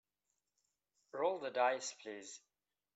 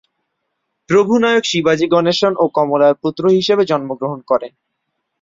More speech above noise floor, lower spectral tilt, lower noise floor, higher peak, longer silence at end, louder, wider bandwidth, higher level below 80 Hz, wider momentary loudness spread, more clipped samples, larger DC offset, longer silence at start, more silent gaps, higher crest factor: second, 49 dB vs 59 dB; second, -2 dB/octave vs -5 dB/octave; first, -88 dBFS vs -73 dBFS; second, -22 dBFS vs 0 dBFS; second, 0.55 s vs 0.75 s; second, -39 LUFS vs -15 LUFS; about the same, 8.2 kHz vs 7.6 kHz; second, under -90 dBFS vs -58 dBFS; first, 17 LU vs 6 LU; neither; neither; first, 1.15 s vs 0.9 s; neither; first, 20 dB vs 14 dB